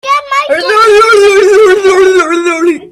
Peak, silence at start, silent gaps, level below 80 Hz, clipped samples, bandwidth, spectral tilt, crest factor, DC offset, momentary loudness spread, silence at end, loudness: 0 dBFS; 0.05 s; none; -46 dBFS; 0.3%; 13.5 kHz; -2 dB/octave; 6 dB; under 0.1%; 6 LU; 0.05 s; -6 LUFS